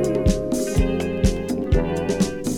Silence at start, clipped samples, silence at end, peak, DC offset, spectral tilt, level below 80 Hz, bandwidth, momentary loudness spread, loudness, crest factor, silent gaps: 0 s; under 0.1%; 0 s; -4 dBFS; under 0.1%; -6 dB/octave; -26 dBFS; 17 kHz; 2 LU; -22 LUFS; 16 dB; none